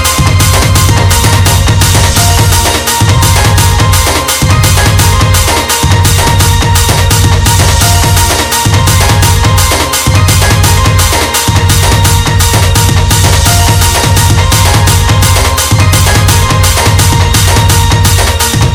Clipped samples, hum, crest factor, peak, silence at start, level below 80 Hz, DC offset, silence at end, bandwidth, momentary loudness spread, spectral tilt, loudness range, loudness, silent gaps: 3%; none; 6 dB; 0 dBFS; 0 s; -16 dBFS; under 0.1%; 0 s; over 20 kHz; 2 LU; -3.5 dB/octave; 0 LU; -6 LUFS; none